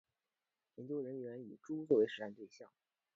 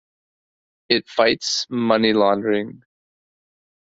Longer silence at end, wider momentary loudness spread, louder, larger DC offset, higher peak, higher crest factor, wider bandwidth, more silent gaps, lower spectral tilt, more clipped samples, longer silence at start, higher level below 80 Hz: second, 0.5 s vs 1.15 s; first, 21 LU vs 6 LU; second, -39 LUFS vs -19 LUFS; neither; second, -20 dBFS vs -2 dBFS; about the same, 22 dB vs 20 dB; about the same, 7.4 kHz vs 8 kHz; neither; first, -5.5 dB/octave vs -3.5 dB/octave; neither; about the same, 0.8 s vs 0.9 s; second, -90 dBFS vs -62 dBFS